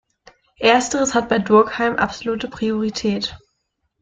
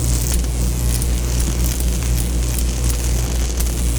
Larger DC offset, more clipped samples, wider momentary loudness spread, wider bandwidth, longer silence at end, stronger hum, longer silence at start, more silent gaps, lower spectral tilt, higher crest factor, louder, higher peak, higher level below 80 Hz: neither; neither; first, 10 LU vs 1 LU; second, 9.4 kHz vs over 20 kHz; first, 0.65 s vs 0 s; neither; first, 0.6 s vs 0 s; neither; about the same, -4 dB/octave vs -4.5 dB/octave; first, 18 dB vs 12 dB; about the same, -19 LUFS vs -20 LUFS; first, -2 dBFS vs -6 dBFS; second, -50 dBFS vs -18 dBFS